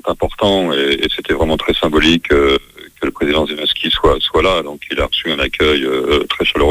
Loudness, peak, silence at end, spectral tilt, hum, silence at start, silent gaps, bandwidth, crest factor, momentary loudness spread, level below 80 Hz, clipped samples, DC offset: -14 LUFS; 0 dBFS; 0 s; -5 dB/octave; none; 0.05 s; none; over 20 kHz; 14 dB; 7 LU; -30 dBFS; under 0.1%; under 0.1%